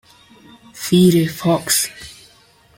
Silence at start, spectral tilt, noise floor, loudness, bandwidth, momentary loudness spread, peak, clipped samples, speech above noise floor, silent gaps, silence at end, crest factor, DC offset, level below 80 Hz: 0.75 s; -4.5 dB/octave; -51 dBFS; -16 LUFS; 17 kHz; 20 LU; -2 dBFS; under 0.1%; 36 dB; none; 0.65 s; 18 dB; under 0.1%; -52 dBFS